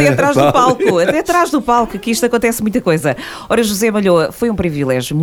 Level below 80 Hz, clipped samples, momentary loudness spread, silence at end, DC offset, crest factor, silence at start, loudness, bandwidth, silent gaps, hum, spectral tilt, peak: -40 dBFS; under 0.1%; 6 LU; 0 s; under 0.1%; 14 dB; 0 s; -14 LUFS; 19.5 kHz; none; none; -5 dB/octave; 0 dBFS